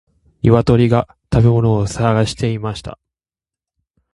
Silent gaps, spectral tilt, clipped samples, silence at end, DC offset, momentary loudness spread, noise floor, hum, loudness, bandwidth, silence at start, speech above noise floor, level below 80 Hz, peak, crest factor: none; -7.5 dB/octave; under 0.1%; 1.2 s; under 0.1%; 12 LU; -90 dBFS; none; -16 LUFS; 11.5 kHz; 0.45 s; 76 dB; -36 dBFS; 0 dBFS; 16 dB